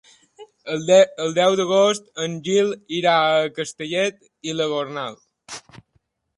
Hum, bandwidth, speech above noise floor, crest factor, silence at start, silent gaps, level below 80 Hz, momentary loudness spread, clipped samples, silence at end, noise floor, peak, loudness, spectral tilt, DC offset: none; 11.5 kHz; 47 dB; 18 dB; 0.4 s; none; -68 dBFS; 17 LU; under 0.1%; 0.8 s; -67 dBFS; -2 dBFS; -20 LUFS; -4 dB/octave; under 0.1%